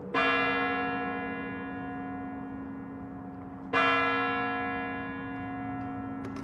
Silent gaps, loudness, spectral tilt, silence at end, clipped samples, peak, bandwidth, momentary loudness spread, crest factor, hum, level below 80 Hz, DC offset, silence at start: none; -31 LUFS; -6 dB/octave; 0 s; under 0.1%; -12 dBFS; 8.6 kHz; 16 LU; 20 dB; none; -58 dBFS; under 0.1%; 0 s